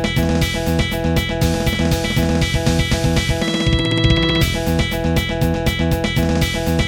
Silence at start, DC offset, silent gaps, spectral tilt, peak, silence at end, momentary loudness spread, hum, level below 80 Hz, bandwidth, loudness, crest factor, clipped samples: 0 s; under 0.1%; none; -5 dB/octave; 0 dBFS; 0 s; 3 LU; none; -24 dBFS; 17 kHz; -18 LUFS; 16 dB; under 0.1%